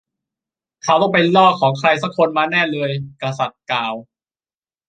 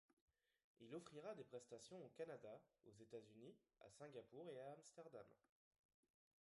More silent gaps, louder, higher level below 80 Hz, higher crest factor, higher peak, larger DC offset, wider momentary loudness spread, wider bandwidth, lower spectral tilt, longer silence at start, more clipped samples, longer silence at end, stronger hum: second, none vs 0.13-0.28 s, 0.64-0.75 s; first, -17 LUFS vs -60 LUFS; first, -64 dBFS vs under -90 dBFS; about the same, 16 dB vs 20 dB; first, -2 dBFS vs -42 dBFS; neither; first, 13 LU vs 9 LU; second, 9.2 kHz vs 11.5 kHz; about the same, -5.5 dB/octave vs -5 dB/octave; first, 0.85 s vs 0.1 s; neither; second, 0.85 s vs 1.1 s; neither